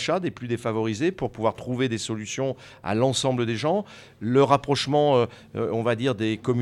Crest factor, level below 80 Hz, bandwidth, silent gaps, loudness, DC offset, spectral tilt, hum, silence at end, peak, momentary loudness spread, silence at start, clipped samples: 20 dB; -58 dBFS; 12.5 kHz; none; -25 LUFS; under 0.1%; -5.5 dB/octave; none; 0 s; -4 dBFS; 9 LU; 0 s; under 0.1%